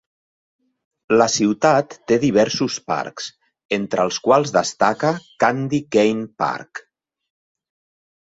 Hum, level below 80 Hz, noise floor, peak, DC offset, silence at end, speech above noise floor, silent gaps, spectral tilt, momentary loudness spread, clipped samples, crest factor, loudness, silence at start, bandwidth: none; -60 dBFS; under -90 dBFS; -2 dBFS; under 0.1%; 1.45 s; over 71 dB; 3.65-3.69 s; -4.5 dB/octave; 10 LU; under 0.1%; 18 dB; -19 LUFS; 1.1 s; 7.8 kHz